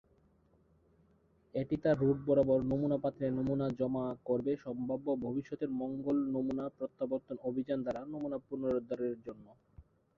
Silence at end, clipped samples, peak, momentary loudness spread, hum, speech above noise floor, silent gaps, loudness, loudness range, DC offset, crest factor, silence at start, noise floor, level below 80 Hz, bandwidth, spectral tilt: 0.35 s; under 0.1%; -18 dBFS; 10 LU; none; 35 dB; none; -35 LUFS; 5 LU; under 0.1%; 18 dB; 1.55 s; -69 dBFS; -64 dBFS; 6.4 kHz; -10 dB/octave